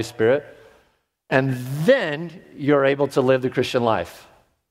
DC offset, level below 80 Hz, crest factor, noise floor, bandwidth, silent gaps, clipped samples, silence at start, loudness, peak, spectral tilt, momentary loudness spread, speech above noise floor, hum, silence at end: under 0.1%; -60 dBFS; 20 dB; -64 dBFS; 16 kHz; none; under 0.1%; 0 s; -21 LUFS; -2 dBFS; -6.5 dB/octave; 9 LU; 44 dB; none; 0.5 s